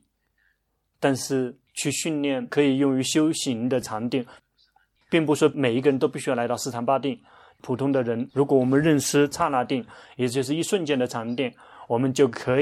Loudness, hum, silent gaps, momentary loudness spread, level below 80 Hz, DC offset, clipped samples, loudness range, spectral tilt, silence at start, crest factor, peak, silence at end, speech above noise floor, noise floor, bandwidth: -24 LUFS; none; none; 9 LU; -64 dBFS; under 0.1%; under 0.1%; 2 LU; -5 dB/octave; 1 s; 18 dB; -6 dBFS; 0 s; 50 dB; -73 dBFS; 15 kHz